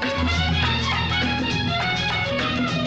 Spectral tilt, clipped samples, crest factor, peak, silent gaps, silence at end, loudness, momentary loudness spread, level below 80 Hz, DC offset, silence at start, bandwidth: -5 dB/octave; under 0.1%; 12 dB; -10 dBFS; none; 0 s; -22 LUFS; 2 LU; -38 dBFS; under 0.1%; 0 s; 8.4 kHz